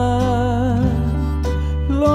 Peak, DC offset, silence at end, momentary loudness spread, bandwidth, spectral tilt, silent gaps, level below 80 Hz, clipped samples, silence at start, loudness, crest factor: -4 dBFS; under 0.1%; 0 s; 4 LU; 11.5 kHz; -8 dB/octave; none; -24 dBFS; under 0.1%; 0 s; -19 LUFS; 12 dB